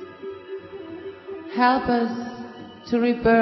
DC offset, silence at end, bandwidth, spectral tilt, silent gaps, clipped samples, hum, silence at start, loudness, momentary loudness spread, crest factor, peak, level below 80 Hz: under 0.1%; 0 s; 6 kHz; -7 dB/octave; none; under 0.1%; none; 0 s; -22 LUFS; 18 LU; 18 dB; -6 dBFS; -50 dBFS